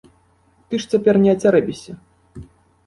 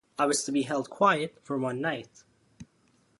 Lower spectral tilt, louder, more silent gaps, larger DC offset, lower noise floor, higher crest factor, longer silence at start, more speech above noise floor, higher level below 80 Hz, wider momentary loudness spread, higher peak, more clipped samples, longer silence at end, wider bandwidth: first, -6.5 dB/octave vs -4 dB/octave; first, -17 LUFS vs -28 LUFS; neither; neither; second, -57 dBFS vs -67 dBFS; about the same, 16 dB vs 20 dB; first, 0.7 s vs 0.2 s; about the same, 41 dB vs 38 dB; first, -52 dBFS vs -70 dBFS; first, 18 LU vs 8 LU; first, -4 dBFS vs -10 dBFS; neither; about the same, 0.45 s vs 0.55 s; about the same, 11.5 kHz vs 11.5 kHz